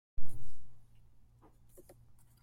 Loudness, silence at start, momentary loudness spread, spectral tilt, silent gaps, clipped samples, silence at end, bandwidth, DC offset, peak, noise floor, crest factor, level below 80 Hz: -59 LUFS; 0.2 s; 15 LU; -6.5 dB/octave; none; under 0.1%; 1.65 s; 12 kHz; under 0.1%; -16 dBFS; -63 dBFS; 14 dB; -52 dBFS